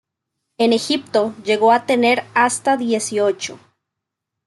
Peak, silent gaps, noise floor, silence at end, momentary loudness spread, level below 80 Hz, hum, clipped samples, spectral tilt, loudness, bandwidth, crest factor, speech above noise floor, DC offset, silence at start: -4 dBFS; none; -81 dBFS; 0.9 s; 6 LU; -70 dBFS; none; under 0.1%; -3 dB/octave; -17 LUFS; 12 kHz; 16 dB; 64 dB; under 0.1%; 0.6 s